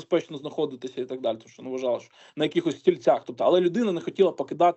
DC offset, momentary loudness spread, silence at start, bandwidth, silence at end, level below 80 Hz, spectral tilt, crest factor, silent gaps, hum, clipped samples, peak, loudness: under 0.1%; 12 LU; 0 s; 8.2 kHz; 0 s; -76 dBFS; -6.5 dB/octave; 18 dB; none; none; under 0.1%; -6 dBFS; -26 LUFS